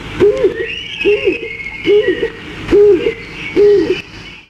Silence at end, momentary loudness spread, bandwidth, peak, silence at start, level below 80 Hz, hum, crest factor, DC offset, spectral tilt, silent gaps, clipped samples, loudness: 0.1 s; 12 LU; 8 kHz; -2 dBFS; 0 s; -38 dBFS; none; 12 dB; under 0.1%; -6 dB/octave; none; under 0.1%; -13 LUFS